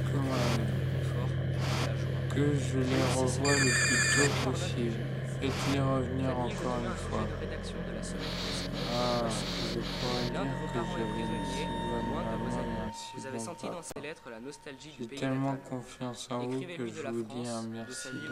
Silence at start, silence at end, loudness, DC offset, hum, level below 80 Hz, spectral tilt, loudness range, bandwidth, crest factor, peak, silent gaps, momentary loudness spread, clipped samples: 0 s; 0 s; -32 LUFS; under 0.1%; none; -48 dBFS; -4.5 dB/octave; 10 LU; 15 kHz; 18 dB; -14 dBFS; none; 12 LU; under 0.1%